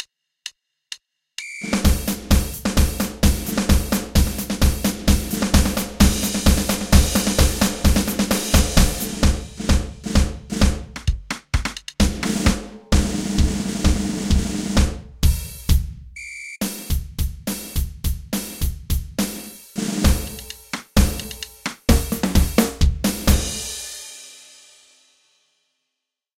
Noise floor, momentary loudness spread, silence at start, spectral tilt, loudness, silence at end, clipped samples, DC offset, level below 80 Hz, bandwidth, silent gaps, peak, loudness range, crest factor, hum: -81 dBFS; 14 LU; 0 s; -4.5 dB/octave; -21 LUFS; 2.05 s; under 0.1%; under 0.1%; -24 dBFS; 17 kHz; none; 0 dBFS; 7 LU; 20 dB; none